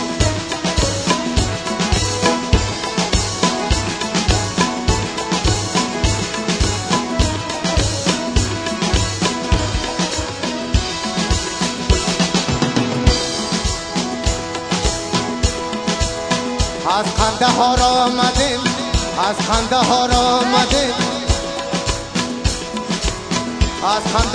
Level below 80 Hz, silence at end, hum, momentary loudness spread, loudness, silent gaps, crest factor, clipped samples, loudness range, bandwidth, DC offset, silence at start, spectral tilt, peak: -26 dBFS; 0 s; none; 6 LU; -18 LUFS; none; 18 dB; under 0.1%; 4 LU; 10.5 kHz; 0.1%; 0 s; -4 dB/octave; 0 dBFS